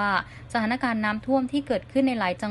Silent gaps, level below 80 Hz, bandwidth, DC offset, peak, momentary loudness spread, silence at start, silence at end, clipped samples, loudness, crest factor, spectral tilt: none; -54 dBFS; 11.5 kHz; under 0.1%; -10 dBFS; 4 LU; 0 s; 0 s; under 0.1%; -26 LUFS; 16 dB; -6 dB/octave